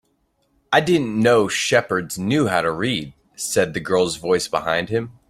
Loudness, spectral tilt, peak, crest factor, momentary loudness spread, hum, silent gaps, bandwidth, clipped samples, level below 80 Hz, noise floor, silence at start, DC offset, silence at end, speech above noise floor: -20 LUFS; -4 dB/octave; -2 dBFS; 18 dB; 7 LU; none; none; 15.5 kHz; under 0.1%; -54 dBFS; -66 dBFS; 0.7 s; under 0.1%; 0.2 s; 47 dB